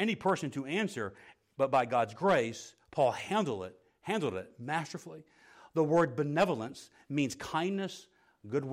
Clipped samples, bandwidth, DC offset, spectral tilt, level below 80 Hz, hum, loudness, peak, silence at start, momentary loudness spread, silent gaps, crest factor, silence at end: under 0.1%; 15.5 kHz; under 0.1%; -5.5 dB/octave; -72 dBFS; none; -33 LUFS; -16 dBFS; 0 s; 17 LU; none; 16 dB; 0 s